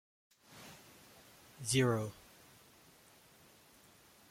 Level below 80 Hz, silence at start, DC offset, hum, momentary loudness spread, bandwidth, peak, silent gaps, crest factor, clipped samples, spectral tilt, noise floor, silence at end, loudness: -72 dBFS; 0.5 s; under 0.1%; none; 29 LU; 16.5 kHz; -18 dBFS; none; 24 dB; under 0.1%; -4.5 dB/octave; -63 dBFS; 2.2 s; -35 LUFS